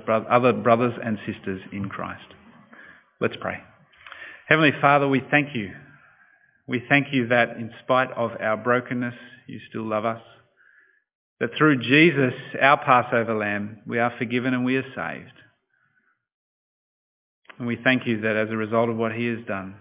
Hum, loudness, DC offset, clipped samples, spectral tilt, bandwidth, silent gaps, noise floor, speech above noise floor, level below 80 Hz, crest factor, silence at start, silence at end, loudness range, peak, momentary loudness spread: none; -22 LUFS; under 0.1%; under 0.1%; -9.5 dB/octave; 4 kHz; 11.15-11.37 s, 16.34-17.42 s; -68 dBFS; 45 dB; -64 dBFS; 24 dB; 0.05 s; 0.05 s; 9 LU; 0 dBFS; 15 LU